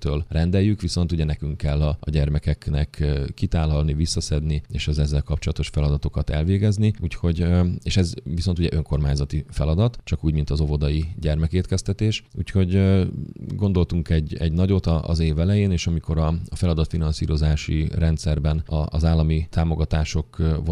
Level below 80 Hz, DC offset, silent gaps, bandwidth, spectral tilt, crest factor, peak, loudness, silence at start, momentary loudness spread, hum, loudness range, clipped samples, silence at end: -28 dBFS; under 0.1%; none; 11 kHz; -7 dB/octave; 16 dB; -6 dBFS; -23 LUFS; 0 s; 5 LU; none; 2 LU; under 0.1%; 0 s